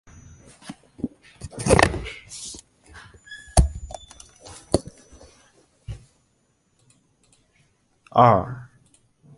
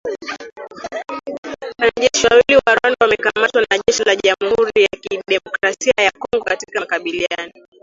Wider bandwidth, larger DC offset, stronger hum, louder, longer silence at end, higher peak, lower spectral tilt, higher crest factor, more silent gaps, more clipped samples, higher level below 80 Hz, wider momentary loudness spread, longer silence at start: first, 12 kHz vs 7.8 kHz; neither; neither; second, -22 LUFS vs -16 LUFS; first, 0.75 s vs 0.35 s; about the same, 0 dBFS vs 0 dBFS; first, -5 dB/octave vs -2 dB/octave; first, 26 dB vs 16 dB; second, none vs 1.38-1.43 s; neither; first, -34 dBFS vs -50 dBFS; first, 27 LU vs 16 LU; first, 0.65 s vs 0.05 s